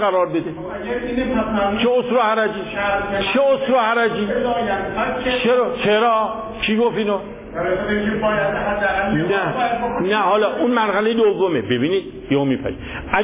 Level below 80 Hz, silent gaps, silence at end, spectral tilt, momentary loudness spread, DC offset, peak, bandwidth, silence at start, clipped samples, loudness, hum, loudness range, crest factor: -42 dBFS; none; 0 s; -9.5 dB/octave; 7 LU; under 0.1%; -4 dBFS; 4 kHz; 0 s; under 0.1%; -19 LUFS; none; 2 LU; 16 dB